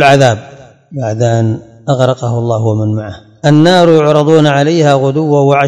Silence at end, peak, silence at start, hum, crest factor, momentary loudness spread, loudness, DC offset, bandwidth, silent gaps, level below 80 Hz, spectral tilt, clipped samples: 0 s; 0 dBFS; 0 s; none; 10 dB; 13 LU; -10 LUFS; under 0.1%; 12 kHz; none; -50 dBFS; -6.5 dB/octave; 2%